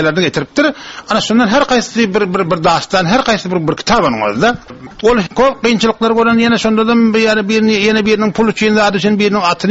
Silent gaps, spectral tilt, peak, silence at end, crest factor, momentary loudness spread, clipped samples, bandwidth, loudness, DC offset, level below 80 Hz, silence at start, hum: none; -3.5 dB/octave; 0 dBFS; 0 s; 12 dB; 4 LU; under 0.1%; 8 kHz; -12 LUFS; under 0.1%; -40 dBFS; 0 s; none